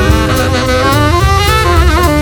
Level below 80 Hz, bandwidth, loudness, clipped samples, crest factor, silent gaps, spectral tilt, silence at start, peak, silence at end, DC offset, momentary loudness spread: -14 dBFS; 19 kHz; -10 LUFS; 0.2%; 8 dB; none; -5 dB/octave; 0 s; 0 dBFS; 0 s; under 0.1%; 2 LU